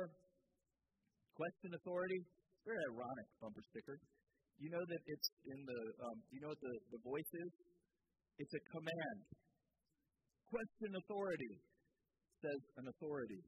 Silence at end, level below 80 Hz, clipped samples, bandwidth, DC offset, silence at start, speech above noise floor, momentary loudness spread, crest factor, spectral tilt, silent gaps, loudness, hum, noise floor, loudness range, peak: 0.05 s; -86 dBFS; under 0.1%; 8.2 kHz; under 0.1%; 0 s; over 42 dB; 11 LU; 24 dB; -5 dB/octave; 5.32-5.37 s; -49 LUFS; none; under -90 dBFS; 3 LU; -26 dBFS